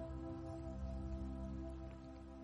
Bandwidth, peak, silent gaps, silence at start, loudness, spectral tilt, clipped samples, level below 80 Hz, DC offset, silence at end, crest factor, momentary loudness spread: 8.4 kHz; -36 dBFS; none; 0 s; -49 LUFS; -8.5 dB/octave; under 0.1%; -50 dBFS; under 0.1%; 0 s; 12 dB; 6 LU